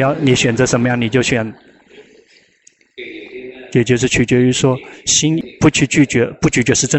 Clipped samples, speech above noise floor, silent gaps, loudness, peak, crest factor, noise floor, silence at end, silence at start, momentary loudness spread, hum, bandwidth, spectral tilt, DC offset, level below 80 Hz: under 0.1%; 39 dB; none; -14 LUFS; -2 dBFS; 14 dB; -53 dBFS; 0 s; 0 s; 18 LU; none; 8.4 kHz; -4.5 dB/octave; under 0.1%; -42 dBFS